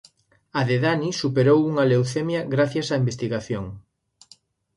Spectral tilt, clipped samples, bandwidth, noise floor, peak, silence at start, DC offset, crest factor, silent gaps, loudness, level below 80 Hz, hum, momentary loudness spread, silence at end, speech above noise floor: -6.5 dB/octave; under 0.1%; 11.5 kHz; -57 dBFS; -6 dBFS; 0.55 s; under 0.1%; 16 dB; none; -22 LUFS; -56 dBFS; none; 11 LU; 0.95 s; 35 dB